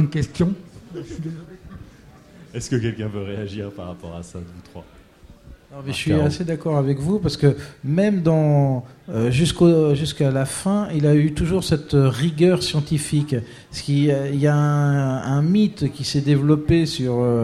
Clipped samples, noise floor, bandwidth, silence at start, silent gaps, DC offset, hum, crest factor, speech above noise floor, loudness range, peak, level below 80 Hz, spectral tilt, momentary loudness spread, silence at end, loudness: under 0.1%; -47 dBFS; 13 kHz; 0 s; none; under 0.1%; none; 18 dB; 27 dB; 11 LU; -2 dBFS; -42 dBFS; -6.5 dB/octave; 17 LU; 0 s; -20 LUFS